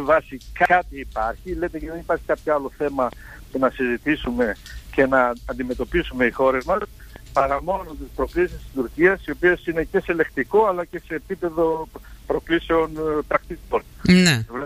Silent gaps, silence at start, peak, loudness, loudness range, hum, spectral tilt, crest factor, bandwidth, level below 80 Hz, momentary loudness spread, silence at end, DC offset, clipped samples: none; 0 s; -2 dBFS; -22 LUFS; 3 LU; none; -5.5 dB/octave; 18 dB; 15.5 kHz; -40 dBFS; 11 LU; 0 s; under 0.1%; under 0.1%